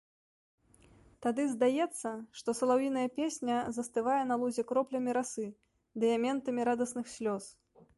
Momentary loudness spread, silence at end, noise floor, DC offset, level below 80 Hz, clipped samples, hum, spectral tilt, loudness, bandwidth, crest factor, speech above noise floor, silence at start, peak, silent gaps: 10 LU; 0.45 s; -62 dBFS; under 0.1%; -74 dBFS; under 0.1%; none; -4.5 dB/octave; -33 LUFS; 11.5 kHz; 16 dB; 30 dB; 1.2 s; -18 dBFS; none